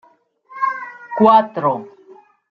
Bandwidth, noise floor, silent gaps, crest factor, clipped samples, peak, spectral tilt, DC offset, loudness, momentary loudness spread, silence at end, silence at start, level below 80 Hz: 6.2 kHz; -50 dBFS; none; 18 dB; under 0.1%; -2 dBFS; -8 dB/octave; under 0.1%; -17 LUFS; 16 LU; 0.6 s; 0.5 s; -66 dBFS